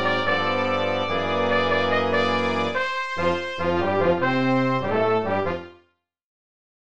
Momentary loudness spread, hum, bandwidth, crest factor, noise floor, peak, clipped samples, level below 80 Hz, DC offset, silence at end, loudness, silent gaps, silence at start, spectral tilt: 4 LU; none; 8.8 kHz; 16 dB; -65 dBFS; -8 dBFS; under 0.1%; -54 dBFS; 1%; 0.65 s; -22 LUFS; none; 0 s; -6 dB/octave